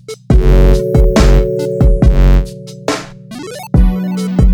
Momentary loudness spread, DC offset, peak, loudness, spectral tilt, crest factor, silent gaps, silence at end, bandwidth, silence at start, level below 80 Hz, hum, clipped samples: 15 LU; under 0.1%; 0 dBFS; -12 LUFS; -7 dB/octave; 10 dB; none; 0 s; 11.5 kHz; 0.1 s; -12 dBFS; none; under 0.1%